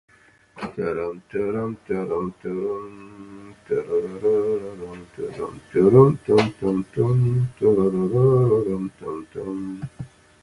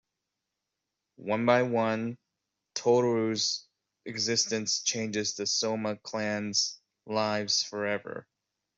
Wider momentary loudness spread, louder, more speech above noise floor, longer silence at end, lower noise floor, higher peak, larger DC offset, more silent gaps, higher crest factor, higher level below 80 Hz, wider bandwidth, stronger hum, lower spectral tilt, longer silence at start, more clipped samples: first, 19 LU vs 14 LU; first, -22 LUFS vs -29 LUFS; second, 29 dB vs 57 dB; second, 0.35 s vs 0.55 s; second, -51 dBFS vs -86 dBFS; first, -2 dBFS vs -8 dBFS; neither; neither; about the same, 22 dB vs 22 dB; first, -52 dBFS vs -74 dBFS; first, 11 kHz vs 8.2 kHz; neither; first, -9 dB/octave vs -3 dB/octave; second, 0.55 s vs 1.2 s; neither